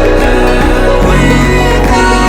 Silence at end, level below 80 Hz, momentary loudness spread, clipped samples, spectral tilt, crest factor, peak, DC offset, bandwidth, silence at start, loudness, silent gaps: 0 s; -12 dBFS; 2 LU; 0.2%; -5.5 dB/octave; 6 dB; 0 dBFS; under 0.1%; 15.5 kHz; 0 s; -9 LUFS; none